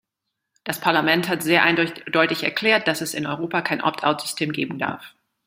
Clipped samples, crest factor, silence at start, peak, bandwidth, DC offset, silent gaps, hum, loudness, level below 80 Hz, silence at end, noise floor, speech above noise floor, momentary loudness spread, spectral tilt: under 0.1%; 22 dB; 0.65 s; 0 dBFS; 16 kHz; under 0.1%; none; none; -21 LUFS; -66 dBFS; 0.35 s; -81 dBFS; 59 dB; 10 LU; -4 dB/octave